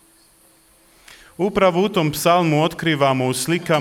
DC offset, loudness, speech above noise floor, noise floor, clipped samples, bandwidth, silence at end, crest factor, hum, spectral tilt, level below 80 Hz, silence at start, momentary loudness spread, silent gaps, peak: under 0.1%; -18 LUFS; 36 dB; -54 dBFS; under 0.1%; 17 kHz; 0 s; 16 dB; none; -5 dB/octave; -52 dBFS; 1.4 s; 5 LU; none; -4 dBFS